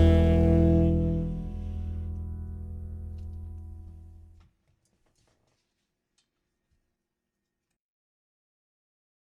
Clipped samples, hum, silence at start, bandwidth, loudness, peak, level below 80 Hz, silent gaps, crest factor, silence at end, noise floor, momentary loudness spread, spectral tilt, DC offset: under 0.1%; none; 0 s; 4.3 kHz; -26 LUFS; -8 dBFS; -36 dBFS; none; 20 dB; 5.15 s; -84 dBFS; 21 LU; -10 dB/octave; under 0.1%